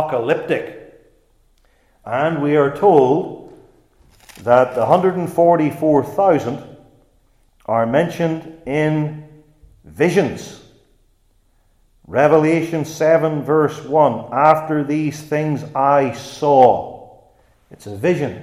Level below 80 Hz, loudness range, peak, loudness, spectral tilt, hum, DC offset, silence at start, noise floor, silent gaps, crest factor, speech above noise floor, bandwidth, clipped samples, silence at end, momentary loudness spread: -56 dBFS; 6 LU; 0 dBFS; -17 LUFS; -7 dB/octave; none; under 0.1%; 0 s; -58 dBFS; none; 18 dB; 42 dB; 15.5 kHz; under 0.1%; 0 s; 13 LU